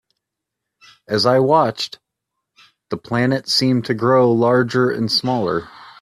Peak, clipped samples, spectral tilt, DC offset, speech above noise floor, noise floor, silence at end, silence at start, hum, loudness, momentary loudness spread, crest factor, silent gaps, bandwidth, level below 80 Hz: -2 dBFS; under 0.1%; -5.5 dB/octave; under 0.1%; 64 dB; -81 dBFS; 0.1 s; 1.1 s; none; -17 LUFS; 11 LU; 16 dB; none; 14.5 kHz; -58 dBFS